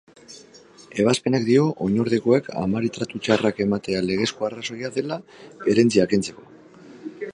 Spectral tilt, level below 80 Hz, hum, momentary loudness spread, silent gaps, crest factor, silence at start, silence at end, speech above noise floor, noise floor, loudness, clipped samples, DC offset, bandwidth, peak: -5.5 dB/octave; -56 dBFS; none; 15 LU; none; 20 dB; 0.3 s; 0 s; 27 dB; -48 dBFS; -22 LUFS; under 0.1%; under 0.1%; 11.5 kHz; -2 dBFS